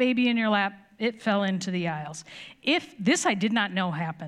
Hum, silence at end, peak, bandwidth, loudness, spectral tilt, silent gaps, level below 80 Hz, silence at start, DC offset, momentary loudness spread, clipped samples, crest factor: none; 0 s; -10 dBFS; 12 kHz; -26 LUFS; -4.5 dB/octave; none; -74 dBFS; 0 s; under 0.1%; 9 LU; under 0.1%; 16 dB